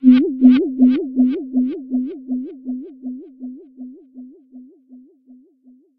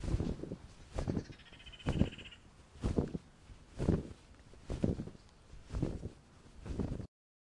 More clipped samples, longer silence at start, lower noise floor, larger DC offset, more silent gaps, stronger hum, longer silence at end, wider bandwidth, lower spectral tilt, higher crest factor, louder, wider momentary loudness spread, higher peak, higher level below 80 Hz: neither; about the same, 0 s vs 0 s; second, -52 dBFS vs -58 dBFS; neither; neither; neither; first, 1 s vs 0.45 s; second, 4.6 kHz vs 11.5 kHz; first, -9 dB/octave vs -7.5 dB/octave; second, 18 dB vs 24 dB; first, -17 LUFS vs -40 LUFS; about the same, 24 LU vs 23 LU; first, 0 dBFS vs -16 dBFS; second, -64 dBFS vs -46 dBFS